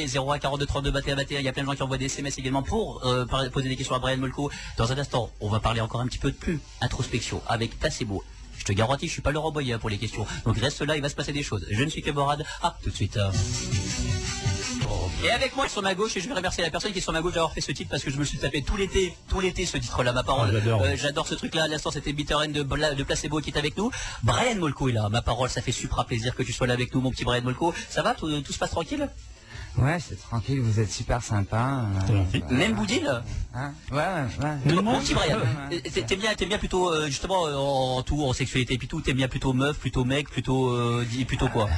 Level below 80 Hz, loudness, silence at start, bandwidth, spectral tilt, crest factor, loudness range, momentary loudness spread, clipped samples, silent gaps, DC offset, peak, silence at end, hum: -38 dBFS; -27 LUFS; 0 s; 11 kHz; -5 dB/octave; 16 dB; 3 LU; 6 LU; under 0.1%; none; under 0.1%; -12 dBFS; 0 s; none